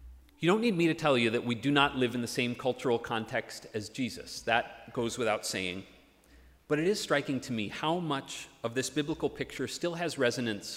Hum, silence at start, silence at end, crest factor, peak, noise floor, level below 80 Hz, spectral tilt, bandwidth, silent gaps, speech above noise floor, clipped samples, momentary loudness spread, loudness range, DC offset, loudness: none; 0 s; 0 s; 22 dB; -10 dBFS; -59 dBFS; -62 dBFS; -4.5 dB/octave; 16 kHz; none; 28 dB; under 0.1%; 10 LU; 5 LU; under 0.1%; -31 LUFS